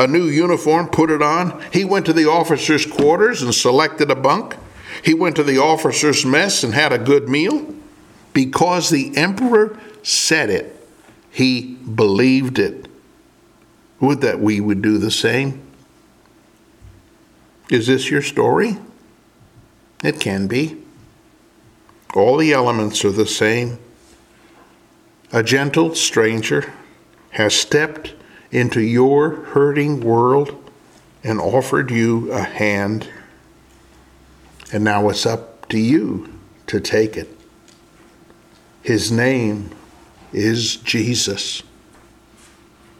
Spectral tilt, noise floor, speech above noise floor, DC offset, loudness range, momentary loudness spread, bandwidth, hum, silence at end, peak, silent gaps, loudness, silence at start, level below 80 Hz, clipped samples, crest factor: -4.5 dB/octave; -51 dBFS; 35 dB; under 0.1%; 6 LU; 12 LU; 16 kHz; none; 1.4 s; 0 dBFS; none; -17 LUFS; 0 s; -54 dBFS; under 0.1%; 18 dB